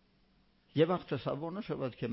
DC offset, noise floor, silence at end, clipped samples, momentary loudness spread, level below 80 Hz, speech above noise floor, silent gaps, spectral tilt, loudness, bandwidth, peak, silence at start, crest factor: under 0.1%; -69 dBFS; 0 s; under 0.1%; 8 LU; -68 dBFS; 36 dB; none; -6 dB/octave; -35 LUFS; 5.6 kHz; -14 dBFS; 0.75 s; 20 dB